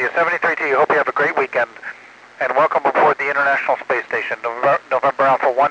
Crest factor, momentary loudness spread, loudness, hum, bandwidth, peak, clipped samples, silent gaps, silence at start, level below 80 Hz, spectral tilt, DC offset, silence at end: 12 dB; 7 LU; -17 LUFS; none; 9.4 kHz; -4 dBFS; under 0.1%; none; 0 s; -70 dBFS; -5 dB/octave; under 0.1%; 0 s